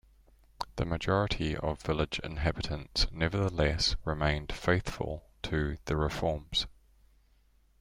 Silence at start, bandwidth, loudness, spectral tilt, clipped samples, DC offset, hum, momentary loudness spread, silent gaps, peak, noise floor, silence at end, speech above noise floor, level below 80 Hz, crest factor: 0.6 s; 15.5 kHz; -32 LUFS; -5 dB/octave; under 0.1%; under 0.1%; none; 8 LU; none; -12 dBFS; -65 dBFS; 1.1 s; 34 dB; -42 dBFS; 20 dB